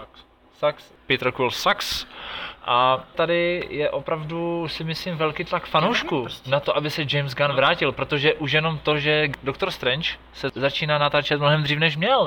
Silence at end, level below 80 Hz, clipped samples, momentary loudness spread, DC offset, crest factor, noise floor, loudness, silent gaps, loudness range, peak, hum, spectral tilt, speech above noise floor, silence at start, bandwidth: 0 s; -52 dBFS; under 0.1%; 8 LU; under 0.1%; 18 dB; -52 dBFS; -22 LUFS; none; 3 LU; -6 dBFS; none; -5 dB/octave; 29 dB; 0 s; 17 kHz